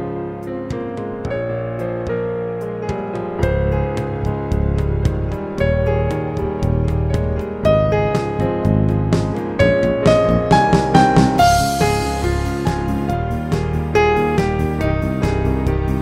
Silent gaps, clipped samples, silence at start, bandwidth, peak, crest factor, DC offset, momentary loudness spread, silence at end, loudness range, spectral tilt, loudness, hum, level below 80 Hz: none; under 0.1%; 0 s; 16 kHz; 0 dBFS; 18 dB; under 0.1%; 10 LU; 0 s; 7 LU; -6.5 dB/octave; -18 LUFS; none; -26 dBFS